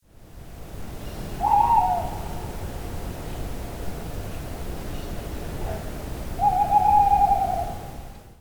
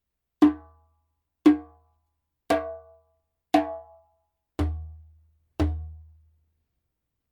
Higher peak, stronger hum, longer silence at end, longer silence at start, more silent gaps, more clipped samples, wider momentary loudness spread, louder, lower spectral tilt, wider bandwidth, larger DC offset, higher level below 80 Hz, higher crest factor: about the same, -6 dBFS vs -6 dBFS; neither; second, 0.05 s vs 1.3 s; second, 0.15 s vs 0.4 s; neither; neither; about the same, 20 LU vs 21 LU; about the same, -25 LUFS vs -26 LUFS; second, -5.5 dB/octave vs -7.5 dB/octave; first, over 20 kHz vs 13 kHz; first, 0.3% vs under 0.1%; first, -36 dBFS vs -42 dBFS; about the same, 18 dB vs 22 dB